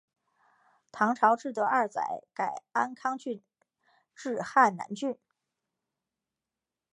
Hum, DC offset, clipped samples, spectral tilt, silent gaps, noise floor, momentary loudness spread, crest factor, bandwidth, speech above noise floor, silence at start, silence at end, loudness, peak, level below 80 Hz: none; under 0.1%; under 0.1%; -5 dB/octave; none; -90 dBFS; 15 LU; 22 dB; 11 kHz; 61 dB; 0.95 s; 1.8 s; -29 LUFS; -10 dBFS; -84 dBFS